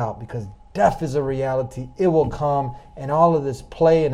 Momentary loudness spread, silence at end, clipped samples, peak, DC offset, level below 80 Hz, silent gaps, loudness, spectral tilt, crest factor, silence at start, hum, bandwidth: 15 LU; 0 s; under 0.1%; -2 dBFS; under 0.1%; -42 dBFS; none; -21 LUFS; -8 dB/octave; 18 dB; 0 s; none; 11.5 kHz